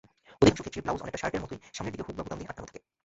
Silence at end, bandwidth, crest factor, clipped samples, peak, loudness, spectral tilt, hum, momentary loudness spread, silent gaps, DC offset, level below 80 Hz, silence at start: 0.3 s; 8 kHz; 24 dB; under 0.1%; -8 dBFS; -31 LUFS; -5 dB/octave; none; 17 LU; none; under 0.1%; -50 dBFS; 0.3 s